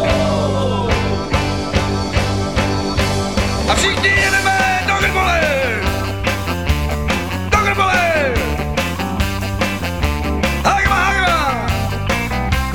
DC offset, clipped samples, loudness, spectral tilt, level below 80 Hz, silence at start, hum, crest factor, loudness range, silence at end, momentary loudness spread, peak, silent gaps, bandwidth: 2%; under 0.1%; -16 LUFS; -4.5 dB/octave; -26 dBFS; 0 s; none; 16 dB; 2 LU; 0 s; 6 LU; 0 dBFS; none; 18.5 kHz